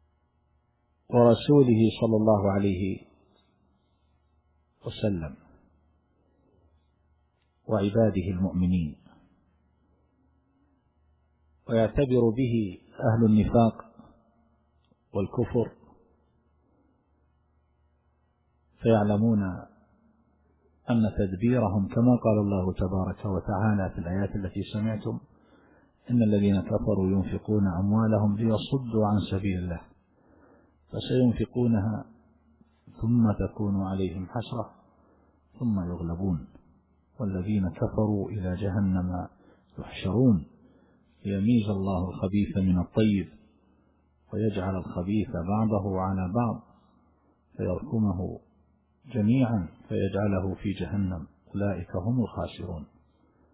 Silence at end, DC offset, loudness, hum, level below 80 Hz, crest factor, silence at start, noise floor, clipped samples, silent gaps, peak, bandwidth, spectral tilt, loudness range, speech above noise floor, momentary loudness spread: 0.7 s; under 0.1%; -27 LUFS; none; -46 dBFS; 20 dB; 1.1 s; -70 dBFS; under 0.1%; none; -8 dBFS; 4 kHz; -12 dB/octave; 9 LU; 45 dB; 13 LU